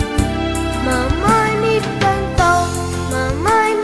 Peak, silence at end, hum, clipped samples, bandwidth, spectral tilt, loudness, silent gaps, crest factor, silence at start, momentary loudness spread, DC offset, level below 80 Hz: -2 dBFS; 0 s; none; under 0.1%; 11 kHz; -5 dB/octave; -16 LUFS; none; 14 dB; 0 s; 5 LU; 0.3%; -28 dBFS